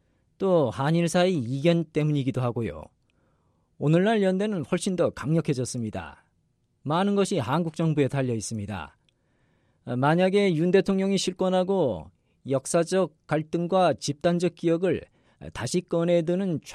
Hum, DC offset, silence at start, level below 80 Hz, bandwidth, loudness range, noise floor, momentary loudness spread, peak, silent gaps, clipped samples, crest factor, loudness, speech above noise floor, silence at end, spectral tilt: none; under 0.1%; 0.4 s; -58 dBFS; 13 kHz; 3 LU; -70 dBFS; 12 LU; -8 dBFS; none; under 0.1%; 18 dB; -25 LUFS; 45 dB; 0 s; -6 dB/octave